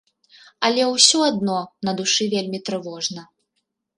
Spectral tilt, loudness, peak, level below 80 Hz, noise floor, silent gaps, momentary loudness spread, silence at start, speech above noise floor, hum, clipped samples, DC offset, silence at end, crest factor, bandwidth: -2.5 dB/octave; -19 LUFS; 0 dBFS; -68 dBFS; -75 dBFS; none; 14 LU; 0.6 s; 55 dB; none; under 0.1%; under 0.1%; 0.75 s; 22 dB; 11.5 kHz